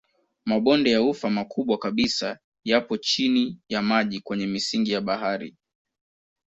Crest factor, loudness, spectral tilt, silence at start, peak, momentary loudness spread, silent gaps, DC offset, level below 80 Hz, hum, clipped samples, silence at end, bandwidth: 18 dB; -24 LUFS; -4.5 dB/octave; 0.45 s; -6 dBFS; 8 LU; 2.44-2.52 s; under 0.1%; -62 dBFS; none; under 0.1%; 0.95 s; 8 kHz